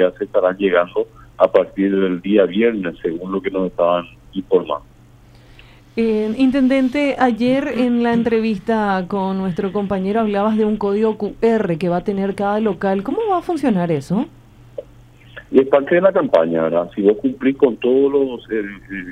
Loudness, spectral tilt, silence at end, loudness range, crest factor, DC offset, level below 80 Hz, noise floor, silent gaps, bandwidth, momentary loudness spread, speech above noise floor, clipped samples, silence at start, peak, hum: -18 LUFS; -8 dB/octave; 0 s; 4 LU; 18 dB; under 0.1%; -48 dBFS; -46 dBFS; none; 10.5 kHz; 9 LU; 29 dB; under 0.1%; 0 s; 0 dBFS; none